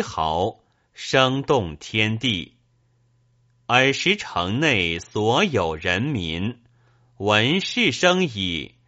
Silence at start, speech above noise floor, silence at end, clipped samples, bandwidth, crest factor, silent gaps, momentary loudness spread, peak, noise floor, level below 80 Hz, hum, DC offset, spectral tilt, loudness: 0 s; 41 dB; 0.2 s; under 0.1%; 8 kHz; 22 dB; none; 10 LU; 0 dBFS; -63 dBFS; -50 dBFS; none; under 0.1%; -3 dB/octave; -21 LUFS